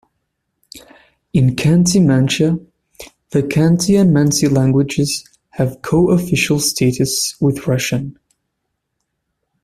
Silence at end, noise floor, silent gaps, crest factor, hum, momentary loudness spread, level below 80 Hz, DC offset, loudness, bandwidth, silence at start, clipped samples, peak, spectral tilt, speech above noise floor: 1.55 s; -74 dBFS; none; 14 dB; none; 9 LU; -44 dBFS; under 0.1%; -15 LUFS; 15 kHz; 0.75 s; under 0.1%; -2 dBFS; -5.5 dB/octave; 60 dB